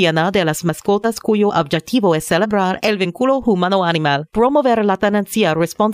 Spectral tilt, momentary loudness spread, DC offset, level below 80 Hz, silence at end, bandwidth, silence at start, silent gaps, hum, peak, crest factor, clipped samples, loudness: -5.5 dB/octave; 3 LU; under 0.1%; -48 dBFS; 0 s; 16 kHz; 0 s; none; none; -2 dBFS; 12 dB; under 0.1%; -16 LUFS